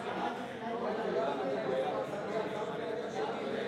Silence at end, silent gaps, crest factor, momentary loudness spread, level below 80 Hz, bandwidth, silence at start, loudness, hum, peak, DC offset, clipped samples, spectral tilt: 0 s; none; 14 dB; 4 LU; -76 dBFS; 13 kHz; 0 s; -36 LUFS; none; -22 dBFS; under 0.1%; under 0.1%; -5.5 dB/octave